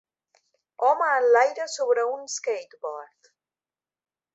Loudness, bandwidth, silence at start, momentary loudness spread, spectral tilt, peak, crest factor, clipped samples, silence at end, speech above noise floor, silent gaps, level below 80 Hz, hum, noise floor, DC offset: -23 LUFS; 8.2 kHz; 0.8 s; 16 LU; 1 dB/octave; -6 dBFS; 20 dB; under 0.1%; 1.3 s; over 66 dB; none; -84 dBFS; none; under -90 dBFS; under 0.1%